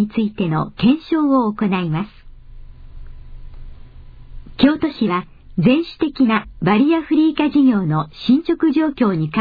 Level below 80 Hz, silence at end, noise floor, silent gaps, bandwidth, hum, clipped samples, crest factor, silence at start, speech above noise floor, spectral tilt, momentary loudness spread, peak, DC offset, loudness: -40 dBFS; 0 s; -38 dBFS; none; 5 kHz; none; under 0.1%; 16 dB; 0 s; 21 dB; -9.5 dB/octave; 6 LU; -2 dBFS; under 0.1%; -17 LUFS